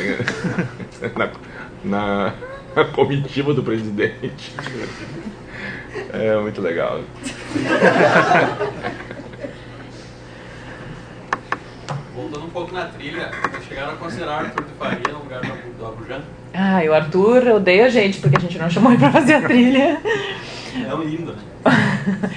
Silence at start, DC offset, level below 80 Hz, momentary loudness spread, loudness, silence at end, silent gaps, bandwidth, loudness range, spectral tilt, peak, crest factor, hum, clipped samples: 0 s; under 0.1%; -48 dBFS; 20 LU; -18 LUFS; 0 s; none; 10 kHz; 14 LU; -6.5 dB/octave; 0 dBFS; 20 dB; none; under 0.1%